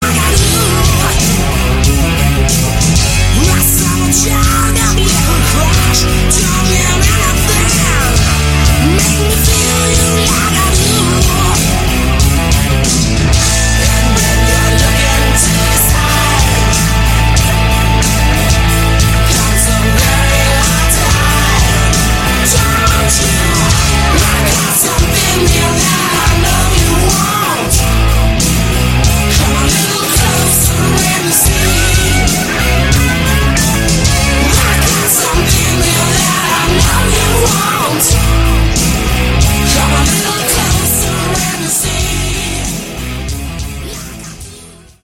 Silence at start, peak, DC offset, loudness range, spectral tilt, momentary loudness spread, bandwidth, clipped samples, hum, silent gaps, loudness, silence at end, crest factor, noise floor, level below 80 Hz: 0 s; 0 dBFS; under 0.1%; 1 LU; -3.5 dB/octave; 3 LU; 17 kHz; under 0.1%; none; none; -10 LUFS; 0.3 s; 10 dB; -35 dBFS; -16 dBFS